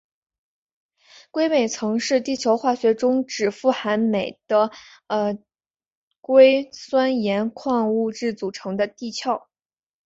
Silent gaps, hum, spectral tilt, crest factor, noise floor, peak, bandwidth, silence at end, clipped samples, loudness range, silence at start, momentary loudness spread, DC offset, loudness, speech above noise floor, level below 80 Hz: 5.86-6.11 s, 6.17-6.23 s; none; -4.5 dB/octave; 20 dB; under -90 dBFS; -2 dBFS; 7.8 kHz; 0.7 s; under 0.1%; 3 LU; 1.35 s; 9 LU; under 0.1%; -21 LUFS; over 69 dB; -66 dBFS